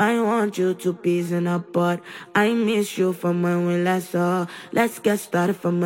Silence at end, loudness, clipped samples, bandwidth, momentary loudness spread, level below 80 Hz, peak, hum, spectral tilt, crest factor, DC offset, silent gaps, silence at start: 0 s; -22 LUFS; under 0.1%; 16.5 kHz; 4 LU; -72 dBFS; -6 dBFS; none; -6 dB/octave; 16 dB; under 0.1%; none; 0 s